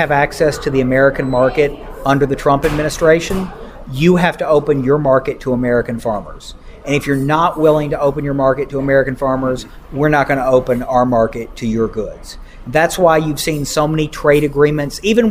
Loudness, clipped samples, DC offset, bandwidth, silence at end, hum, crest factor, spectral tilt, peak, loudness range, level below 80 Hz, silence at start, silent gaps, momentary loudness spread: -15 LUFS; under 0.1%; under 0.1%; 16 kHz; 0 s; none; 14 dB; -6 dB/octave; 0 dBFS; 2 LU; -34 dBFS; 0 s; none; 11 LU